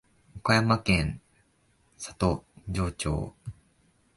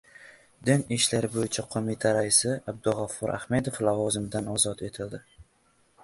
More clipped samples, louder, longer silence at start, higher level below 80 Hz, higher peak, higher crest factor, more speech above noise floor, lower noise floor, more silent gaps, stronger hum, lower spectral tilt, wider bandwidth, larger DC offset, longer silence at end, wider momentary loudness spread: neither; about the same, -28 LUFS vs -27 LUFS; first, 0.35 s vs 0.2 s; first, -42 dBFS vs -56 dBFS; about the same, -8 dBFS vs -6 dBFS; about the same, 22 dB vs 22 dB; about the same, 40 dB vs 38 dB; about the same, -67 dBFS vs -66 dBFS; neither; neither; first, -5.5 dB/octave vs -4 dB/octave; about the same, 11.5 kHz vs 12 kHz; neither; about the same, 0.65 s vs 0.6 s; first, 19 LU vs 11 LU